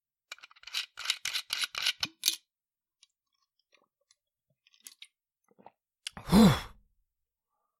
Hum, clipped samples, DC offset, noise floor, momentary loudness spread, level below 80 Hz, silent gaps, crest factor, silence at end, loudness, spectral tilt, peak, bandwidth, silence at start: none; under 0.1%; under 0.1%; under -90 dBFS; 27 LU; -52 dBFS; none; 28 dB; 1.15 s; -29 LUFS; -4 dB/octave; -6 dBFS; 16.5 kHz; 0.3 s